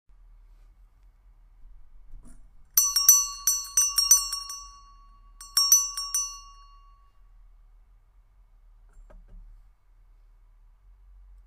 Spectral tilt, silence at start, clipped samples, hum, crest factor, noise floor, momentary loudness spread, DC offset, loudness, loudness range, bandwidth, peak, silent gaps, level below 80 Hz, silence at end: 4 dB/octave; 1.65 s; under 0.1%; none; 28 dB; -57 dBFS; 17 LU; under 0.1%; -21 LUFS; 6 LU; 16 kHz; -2 dBFS; none; -52 dBFS; 2.05 s